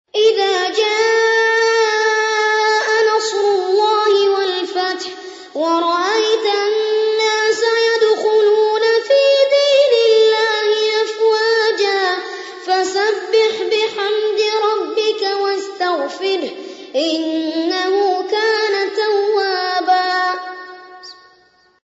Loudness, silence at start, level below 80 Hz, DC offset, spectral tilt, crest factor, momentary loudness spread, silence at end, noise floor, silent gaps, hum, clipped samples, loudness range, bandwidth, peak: -15 LUFS; 0.15 s; -74 dBFS; under 0.1%; -0.5 dB/octave; 14 dB; 8 LU; 0.7 s; -53 dBFS; none; none; under 0.1%; 5 LU; 8 kHz; -2 dBFS